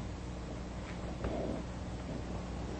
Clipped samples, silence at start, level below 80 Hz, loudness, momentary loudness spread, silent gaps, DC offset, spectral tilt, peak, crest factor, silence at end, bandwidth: under 0.1%; 0 s; -46 dBFS; -41 LUFS; 5 LU; none; under 0.1%; -6.5 dB/octave; -24 dBFS; 16 dB; 0 s; 8.4 kHz